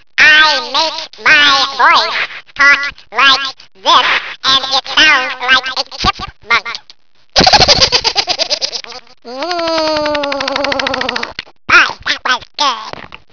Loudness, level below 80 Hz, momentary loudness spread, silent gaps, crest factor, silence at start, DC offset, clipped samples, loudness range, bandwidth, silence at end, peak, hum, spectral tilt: -10 LUFS; -38 dBFS; 16 LU; none; 12 dB; 0.2 s; 0.7%; 0.7%; 5 LU; 5.4 kHz; 0.3 s; 0 dBFS; none; -1.5 dB/octave